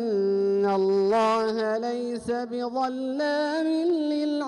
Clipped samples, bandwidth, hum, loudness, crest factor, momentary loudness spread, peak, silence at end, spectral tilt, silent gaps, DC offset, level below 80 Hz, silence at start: under 0.1%; 11 kHz; none; -25 LUFS; 8 dB; 7 LU; -16 dBFS; 0 s; -6 dB/octave; none; under 0.1%; -66 dBFS; 0 s